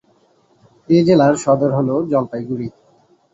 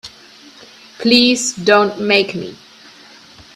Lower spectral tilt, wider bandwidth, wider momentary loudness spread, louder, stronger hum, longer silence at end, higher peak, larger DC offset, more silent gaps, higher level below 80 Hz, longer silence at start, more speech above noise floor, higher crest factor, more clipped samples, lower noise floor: first, -7 dB/octave vs -3 dB/octave; second, 8.2 kHz vs 14 kHz; second, 13 LU vs 18 LU; second, -16 LUFS vs -13 LUFS; neither; second, 0.65 s vs 1 s; about the same, -2 dBFS vs 0 dBFS; neither; neither; about the same, -56 dBFS vs -58 dBFS; first, 0.9 s vs 0.05 s; first, 41 dB vs 28 dB; about the same, 16 dB vs 18 dB; neither; first, -56 dBFS vs -42 dBFS